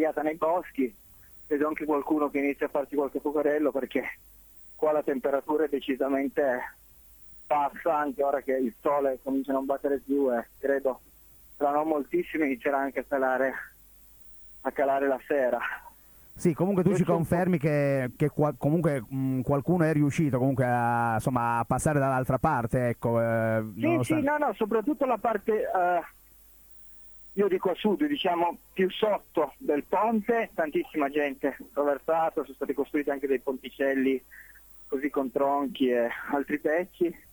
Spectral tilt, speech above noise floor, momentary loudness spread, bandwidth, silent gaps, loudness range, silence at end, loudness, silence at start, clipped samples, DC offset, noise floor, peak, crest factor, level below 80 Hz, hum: -7 dB/octave; 28 dB; 7 LU; over 20 kHz; none; 3 LU; 0.15 s; -28 LUFS; 0 s; under 0.1%; under 0.1%; -55 dBFS; -10 dBFS; 18 dB; -58 dBFS; none